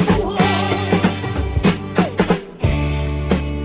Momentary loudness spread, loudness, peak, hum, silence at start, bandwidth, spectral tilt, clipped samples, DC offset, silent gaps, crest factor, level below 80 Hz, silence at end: 4 LU; -19 LUFS; 0 dBFS; none; 0 s; 4 kHz; -11 dB/octave; under 0.1%; under 0.1%; none; 16 dB; -26 dBFS; 0 s